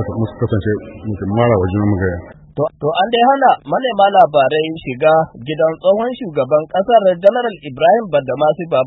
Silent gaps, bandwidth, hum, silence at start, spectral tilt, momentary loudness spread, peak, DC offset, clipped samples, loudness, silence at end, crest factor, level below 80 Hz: none; 4.1 kHz; none; 0 s; -9.5 dB/octave; 11 LU; 0 dBFS; under 0.1%; under 0.1%; -15 LUFS; 0 s; 14 dB; -46 dBFS